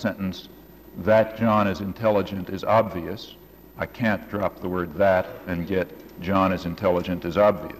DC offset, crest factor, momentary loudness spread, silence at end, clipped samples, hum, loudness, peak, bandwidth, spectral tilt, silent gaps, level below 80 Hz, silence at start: under 0.1%; 14 dB; 13 LU; 0 s; under 0.1%; none; -24 LUFS; -10 dBFS; 15 kHz; -7.5 dB/octave; none; -50 dBFS; 0 s